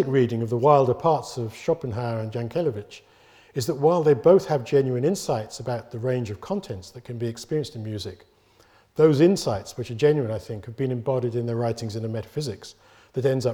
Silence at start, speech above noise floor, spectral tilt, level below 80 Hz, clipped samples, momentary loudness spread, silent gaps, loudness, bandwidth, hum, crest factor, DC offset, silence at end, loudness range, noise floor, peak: 0 s; 34 dB; -7 dB/octave; -58 dBFS; under 0.1%; 16 LU; none; -24 LUFS; 19 kHz; none; 20 dB; under 0.1%; 0 s; 6 LU; -58 dBFS; -4 dBFS